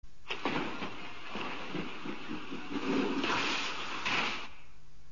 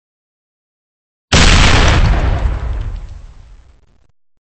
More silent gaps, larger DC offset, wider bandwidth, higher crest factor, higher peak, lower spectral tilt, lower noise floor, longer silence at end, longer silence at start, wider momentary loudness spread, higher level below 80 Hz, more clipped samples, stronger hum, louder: neither; first, 1% vs under 0.1%; second, 7.2 kHz vs 8.8 kHz; about the same, 18 dB vs 14 dB; second, -20 dBFS vs 0 dBFS; second, -1.5 dB/octave vs -4 dB/octave; first, -58 dBFS vs -48 dBFS; second, 0 s vs 1.15 s; second, 0 s vs 1.3 s; second, 11 LU vs 17 LU; second, -60 dBFS vs -18 dBFS; neither; neither; second, -35 LUFS vs -12 LUFS